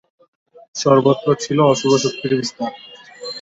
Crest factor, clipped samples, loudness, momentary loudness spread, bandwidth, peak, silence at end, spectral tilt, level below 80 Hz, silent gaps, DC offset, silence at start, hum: 16 dB; under 0.1%; -17 LUFS; 17 LU; 8 kHz; -2 dBFS; 0 s; -5 dB/octave; -60 dBFS; none; under 0.1%; 0.75 s; none